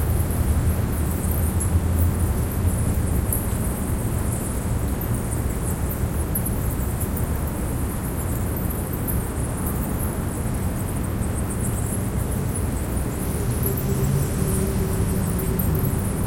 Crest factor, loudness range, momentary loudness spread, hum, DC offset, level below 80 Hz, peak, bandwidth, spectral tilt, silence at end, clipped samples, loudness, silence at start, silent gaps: 14 dB; 3 LU; 4 LU; none; under 0.1%; -28 dBFS; -8 dBFS; 17 kHz; -6 dB/octave; 0 s; under 0.1%; -24 LUFS; 0 s; none